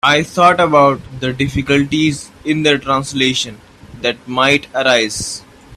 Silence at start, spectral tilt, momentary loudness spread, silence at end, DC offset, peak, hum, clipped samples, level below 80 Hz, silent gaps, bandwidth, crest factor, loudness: 0.05 s; -4 dB/octave; 11 LU; 0 s; under 0.1%; 0 dBFS; none; under 0.1%; -44 dBFS; none; 14 kHz; 16 dB; -14 LUFS